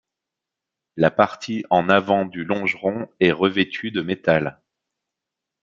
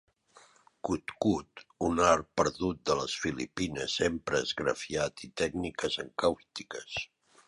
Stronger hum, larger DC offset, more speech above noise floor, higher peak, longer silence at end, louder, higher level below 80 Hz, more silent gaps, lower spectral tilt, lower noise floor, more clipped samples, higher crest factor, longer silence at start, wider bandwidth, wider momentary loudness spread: neither; neither; first, 65 dB vs 30 dB; first, -2 dBFS vs -10 dBFS; first, 1.1 s vs 0.4 s; first, -21 LUFS vs -32 LUFS; second, -60 dBFS vs -54 dBFS; neither; first, -6.5 dB/octave vs -4 dB/octave; first, -85 dBFS vs -61 dBFS; neither; about the same, 22 dB vs 22 dB; about the same, 0.95 s vs 0.85 s; second, 7.6 kHz vs 11.5 kHz; second, 8 LU vs 11 LU